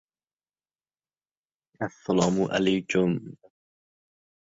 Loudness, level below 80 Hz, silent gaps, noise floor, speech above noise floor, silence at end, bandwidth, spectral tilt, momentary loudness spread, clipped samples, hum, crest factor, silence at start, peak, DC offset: -26 LUFS; -62 dBFS; none; under -90 dBFS; over 65 dB; 1.15 s; 8 kHz; -5.5 dB/octave; 11 LU; under 0.1%; none; 24 dB; 1.8 s; -6 dBFS; under 0.1%